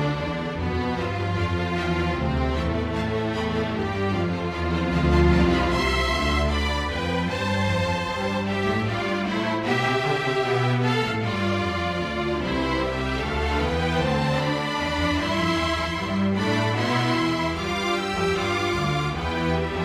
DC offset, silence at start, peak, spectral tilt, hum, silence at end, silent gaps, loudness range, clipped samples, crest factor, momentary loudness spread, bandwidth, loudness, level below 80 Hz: under 0.1%; 0 s; -6 dBFS; -6 dB/octave; none; 0 s; none; 3 LU; under 0.1%; 16 dB; 4 LU; 14.5 kHz; -24 LUFS; -34 dBFS